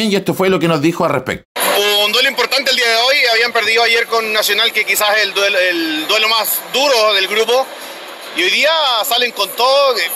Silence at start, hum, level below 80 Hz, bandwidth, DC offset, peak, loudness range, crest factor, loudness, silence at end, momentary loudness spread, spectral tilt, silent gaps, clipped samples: 0 s; none; -56 dBFS; 16 kHz; under 0.1%; -2 dBFS; 2 LU; 12 dB; -12 LUFS; 0 s; 6 LU; -2.5 dB/octave; 1.45-1.55 s; under 0.1%